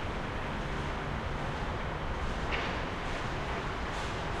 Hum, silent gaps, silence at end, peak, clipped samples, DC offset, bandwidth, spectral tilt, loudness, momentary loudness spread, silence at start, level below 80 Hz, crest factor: none; none; 0 s; -18 dBFS; under 0.1%; under 0.1%; 12.5 kHz; -5.5 dB/octave; -35 LUFS; 3 LU; 0 s; -40 dBFS; 16 dB